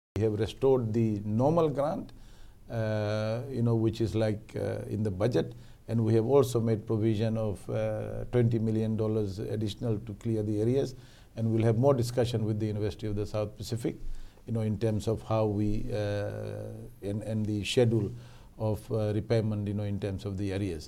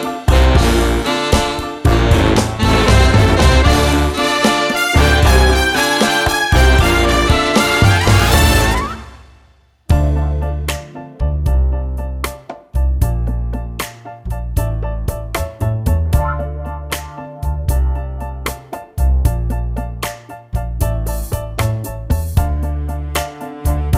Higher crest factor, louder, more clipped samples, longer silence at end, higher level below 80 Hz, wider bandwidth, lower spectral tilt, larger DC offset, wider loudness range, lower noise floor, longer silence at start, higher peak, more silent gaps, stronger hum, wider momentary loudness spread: about the same, 18 dB vs 14 dB; second, -30 LUFS vs -15 LUFS; neither; about the same, 0 s vs 0 s; second, -48 dBFS vs -18 dBFS; second, 13.5 kHz vs 16.5 kHz; first, -7.5 dB/octave vs -5 dB/octave; neither; second, 3 LU vs 9 LU; about the same, -49 dBFS vs -50 dBFS; first, 0.15 s vs 0 s; second, -12 dBFS vs 0 dBFS; neither; neither; second, 10 LU vs 14 LU